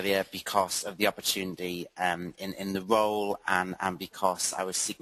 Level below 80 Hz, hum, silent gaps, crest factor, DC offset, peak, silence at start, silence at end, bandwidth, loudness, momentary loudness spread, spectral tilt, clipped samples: -66 dBFS; none; none; 22 dB; under 0.1%; -8 dBFS; 0 s; 0.05 s; 13 kHz; -30 LUFS; 8 LU; -2.5 dB/octave; under 0.1%